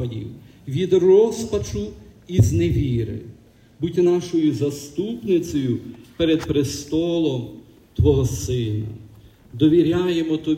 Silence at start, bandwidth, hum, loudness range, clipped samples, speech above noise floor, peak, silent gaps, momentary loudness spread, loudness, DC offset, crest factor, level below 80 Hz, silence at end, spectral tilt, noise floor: 0 s; 16 kHz; none; 3 LU; under 0.1%; 27 dB; -4 dBFS; none; 17 LU; -21 LUFS; under 0.1%; 16 dB; -40 dBFS; 0 s; -7 dB/octave; -46 dBFS